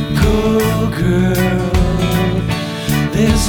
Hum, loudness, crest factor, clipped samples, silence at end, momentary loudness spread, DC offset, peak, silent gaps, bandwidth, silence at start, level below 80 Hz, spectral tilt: none; -15 LUFS; 14 dB; under 0.1%; 0 s; 4 LU; under 0.1%; 0 dBFS; none; over 20 kHz; 0 s; -22 dBFS; -6 dB/octave